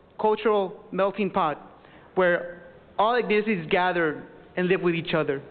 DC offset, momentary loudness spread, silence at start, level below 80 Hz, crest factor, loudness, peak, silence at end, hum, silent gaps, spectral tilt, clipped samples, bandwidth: under 0.1%; 10 LU; 0.2 s; -62 dBFS; 14 dB; -25 LUFS; -12 dBFS; 0 s; none; none; -9.5 dB/octave; under 0.1%; 4.6 kHz